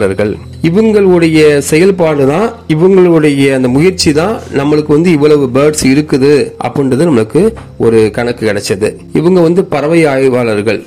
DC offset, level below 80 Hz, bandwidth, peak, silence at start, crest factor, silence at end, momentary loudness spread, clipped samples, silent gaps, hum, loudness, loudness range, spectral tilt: 0.4%; -38 dBFS; 15 kHz; 0 dBFS; 0 s; 8 dB; 0 s; 7 LU; 1%; none; none; -9 LUFS; 3 LU; -6 dB/octave